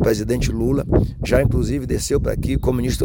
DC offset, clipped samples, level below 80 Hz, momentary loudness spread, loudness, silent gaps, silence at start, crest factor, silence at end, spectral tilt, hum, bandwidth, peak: under 0.1%; under 0.1%; -26 dBFS; 4 LU; -20 LUFS; none; 0 s; 14 dB; 0 s; -6.5 dB/octave; none; 17 kHz; -4 dBFS